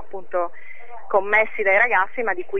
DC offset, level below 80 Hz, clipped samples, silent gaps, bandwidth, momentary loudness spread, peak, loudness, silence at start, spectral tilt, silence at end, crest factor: 5%; -64 dBFS; under 0.1%; none; 6.4 kHz; 10 LU; -6 dBFS; -20 LUFS; 0.15 s; -6 dB/octave; 0 s; 16 dB